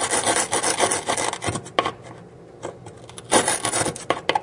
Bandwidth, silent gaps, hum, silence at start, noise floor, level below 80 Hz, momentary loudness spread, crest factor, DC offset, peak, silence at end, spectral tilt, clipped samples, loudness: 11.5 kHz; none; none; 0 s; -43 dBFS; -58 dBFS; 20 LU; 24 dB; under 0.1%; 0 dBFS; 0 s; -2 dB/octave; under 0.1%; -22 LUFS